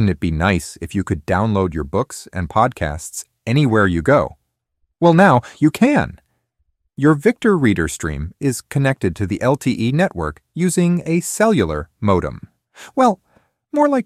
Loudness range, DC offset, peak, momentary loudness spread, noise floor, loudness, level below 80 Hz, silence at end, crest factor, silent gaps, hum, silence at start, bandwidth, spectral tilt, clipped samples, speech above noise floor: 4 LU; under 0.1%; 0 dBFS; 11 LU; -69 dBFS; -18 LUFS; -38 dBFS; 0.05 s; 16 dB; none; none; 0 s; 15 kHz; -6 dB/octave; under 0.1%; 52 dB